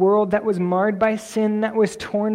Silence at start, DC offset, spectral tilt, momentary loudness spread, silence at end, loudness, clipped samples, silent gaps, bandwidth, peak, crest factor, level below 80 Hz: 0 s; under 0.1%; -6.5 dB/octave; 3 LU; 0 s; -21 LUFS; under 0.1%; none; 14 kHz; -6 dBFS; 14 dB; -56 dBFS